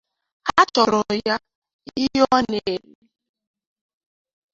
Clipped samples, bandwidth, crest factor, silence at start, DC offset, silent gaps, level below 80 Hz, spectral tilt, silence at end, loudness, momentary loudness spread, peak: under 0.1%; 7.8 kHz; 22 dB; 0.45 s; under 0.1%; 1.55-1.62 s, 1.73-1.79 s; -56 dBFS; -4 dB/octave; 1.75 s; -20 LUFS; 12 LU; -2 dBFS